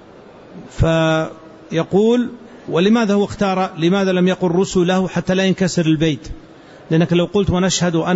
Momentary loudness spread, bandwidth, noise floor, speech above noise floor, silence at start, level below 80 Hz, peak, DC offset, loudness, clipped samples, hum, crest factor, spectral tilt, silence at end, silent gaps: 8 LU; 8 kHz; -41 dBFS; 25 dB; 0.5 s; -38 dBFS; -4 dBFS; under 0.1%; -17 LUFS; under 0.1%; none; 12 dB; -6 dB/octave; 0 s; none